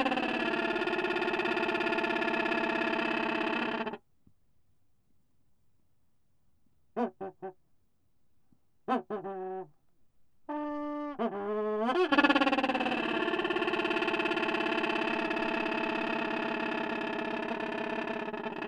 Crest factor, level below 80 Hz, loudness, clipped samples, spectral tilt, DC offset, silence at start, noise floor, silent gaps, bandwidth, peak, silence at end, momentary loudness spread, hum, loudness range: 22 dB; -68 dBFS; -31 LUFS; under 0.1%; -5 dB/octave; under 0.1%; 0 s; -76 dBFS; none; 11.5 kHz; -10 dBFS; 0 s; 9 LU; none; 15 LU